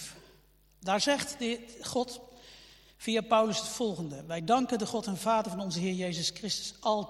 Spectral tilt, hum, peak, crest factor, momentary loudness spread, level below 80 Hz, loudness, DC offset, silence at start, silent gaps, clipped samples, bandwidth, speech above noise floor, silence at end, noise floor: -4 dB/octave; none; -12 dBFS; 20 dB; 13 LU; -64 dBFS; -31 LUFS; under 0.1%; 0 s; none; under 0.1%; 16.5 kHz; 31 dB; 0 s; -63 dBFS